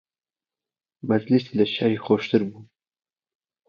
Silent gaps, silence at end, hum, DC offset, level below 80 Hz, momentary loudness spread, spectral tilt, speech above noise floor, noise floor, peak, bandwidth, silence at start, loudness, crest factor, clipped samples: none; 1.05 s; none; under 0.1%; -68 dBFS; 7 LU; -8 dB/octave; over 68 dB; under -90 dBFS; -6 dBFS; 6.8 kHz; 1.05 s; -23 LUFS; 20 dB; under 0.1%